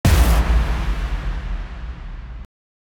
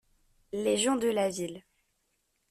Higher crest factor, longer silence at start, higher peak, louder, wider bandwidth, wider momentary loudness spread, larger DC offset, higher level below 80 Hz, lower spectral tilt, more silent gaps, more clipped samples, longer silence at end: about the same, 16 dB vs 18 dB; second, 0.05 s vs 0.55 s; first, -4 dBFS vs -16 dBFS; first, -21 LUFS vs -30 LUFS; first, 19 kHz vs 14.5 kHz; first, 20 LU vs 13 LU; neither; first, -20 dBFS vs -68 dBFS; first, -5.5 dB/octave vs -3.5 dB/octave; neither; neither; second, 0.55 s vs 0.9 s